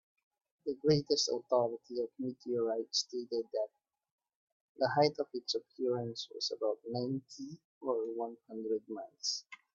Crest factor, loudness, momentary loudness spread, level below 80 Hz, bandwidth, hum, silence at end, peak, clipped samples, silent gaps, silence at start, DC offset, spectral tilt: 22 dB; -36 LUFS; 11 LU; -78 dBFS; 7.8 kHz; none; 0.2 s; -14 dBFS; under 0.1%; 4.12-4.18 s, 4.35-4.75 s, 7.65-7.81 s; 0.65 s; under 0.1%; -4.5 dB/octave